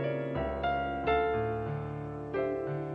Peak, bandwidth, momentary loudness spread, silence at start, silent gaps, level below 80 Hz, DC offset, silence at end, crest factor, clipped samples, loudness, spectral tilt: -16 dBFS; 5.8 kHz; 8 LU; 0 s; none; -48 dBFS; under 0.1%; 0 s; 16 dB; under 0.1%; -33 LUFS; -9 dB/octave